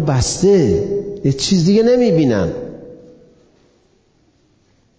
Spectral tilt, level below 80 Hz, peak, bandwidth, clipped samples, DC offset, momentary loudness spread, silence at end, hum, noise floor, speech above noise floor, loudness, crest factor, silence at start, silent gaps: -6 dB/octave; -38 dBFS; -4 dBFS; 8 kHz; under 0.1%; under 0.1%; 12 LU; 2.05 s; none; -57 dBFS; 43 dB; -14 LUFS; 12 dB; 0 s; none